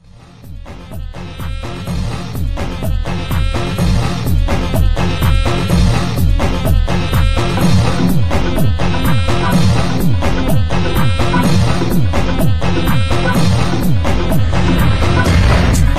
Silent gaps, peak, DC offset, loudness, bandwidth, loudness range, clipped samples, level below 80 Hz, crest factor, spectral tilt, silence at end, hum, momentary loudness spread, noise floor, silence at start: none; 0 dBFS; under 0.1%; -15 LUFS; 15 kHz; 5 LU; under 0.1%; -20 dBFS; 12 dB; -6 dB/octave; 0 s; none; 9 LU; -37 dBFS; 0.45 s